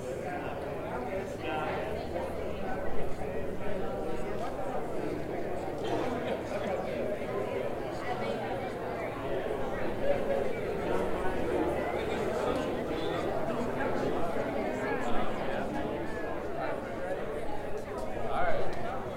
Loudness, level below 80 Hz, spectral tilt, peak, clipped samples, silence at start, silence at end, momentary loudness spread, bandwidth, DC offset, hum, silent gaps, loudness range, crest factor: -34 LUFS; -48 dBFS; -6.5 dB/octave; -14 dBFS; under 0.1%; 0 s; 0 s; 5 LU; 16.5 kHz; 0.2%; none; none; 4 LU; 18 dB